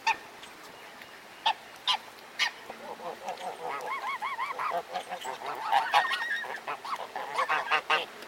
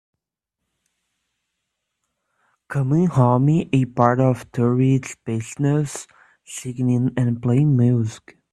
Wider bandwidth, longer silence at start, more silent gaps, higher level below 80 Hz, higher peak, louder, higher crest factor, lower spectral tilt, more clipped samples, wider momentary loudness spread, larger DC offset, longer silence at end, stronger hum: first, 17 kHz vs 12 kHz; second, 0 s vs 2.7 s; neither; second, -78 dBFS vs -56 dBFS; second, -10 dBFS vs 0 dBFS; second, -31 LUFS vs -20 LUFS; about the same, 24 dB vs 20 dB; second, -0.5 dB/octave vs -8 dB/octave; neither; first, 19 LU vs 12 LU; neither; second, 0 s vs 0.35 s; neither